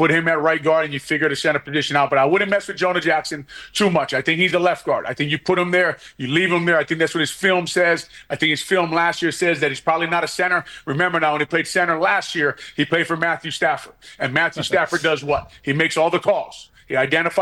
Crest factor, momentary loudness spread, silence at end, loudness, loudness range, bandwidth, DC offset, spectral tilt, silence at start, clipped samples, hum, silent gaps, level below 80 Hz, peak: 14 dB; 6 LU; 0 s; -19 LUFS; 2 LU; 16.5 kHz; under 0.1%; -4.5 dB/octave; 0 s; under 0.1%; none; none; -56 dBFS; -4 dBFS